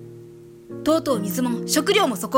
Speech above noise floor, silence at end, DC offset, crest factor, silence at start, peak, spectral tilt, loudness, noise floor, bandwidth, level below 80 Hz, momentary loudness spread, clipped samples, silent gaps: 23 dB; 0 s; under 0.1%; 18 dB; 0 s; -4 dBFS; -4 dB/octave; -21 LUFS; -43 dBFS; 16.5 kHz; -58 dBFS; 13 LU; under 0.1%; none